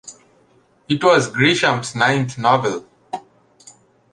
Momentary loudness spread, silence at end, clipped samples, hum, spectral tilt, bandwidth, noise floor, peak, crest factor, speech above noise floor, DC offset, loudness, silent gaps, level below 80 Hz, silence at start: 18 LU; 0.95 s; under 0.1%; none; -4.5 dB/octave; 11 kHz; -56 dBFS; -2 dBFS; 18 dB; 39 dB; under 0.1%; -17 LUFS; none; -60 dBFS; 0.05 s